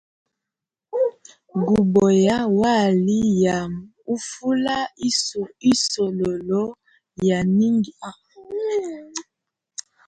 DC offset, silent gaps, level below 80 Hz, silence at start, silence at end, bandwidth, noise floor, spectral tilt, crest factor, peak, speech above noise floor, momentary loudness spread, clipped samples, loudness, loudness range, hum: under 0.1%; none; -54 dBFS; 0.95 s; 0.85 s; 9.6 kHz; -87 dBFS; -5 dB/octave; 16 dB; -6 dBFS; 67 dB; 15 LU; under 0.1%; -21 LUFS; 5 LU; none